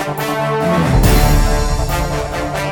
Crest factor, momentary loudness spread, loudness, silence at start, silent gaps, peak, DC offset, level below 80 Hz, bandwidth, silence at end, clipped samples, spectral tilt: 14 dB; 8 LU; -16 LUFS; 0 s; none; 0 dBFS; under 0.1%; -18 dBFS; 19.5 kHz; 0 s; under 0.1%; -5.5 dB/octave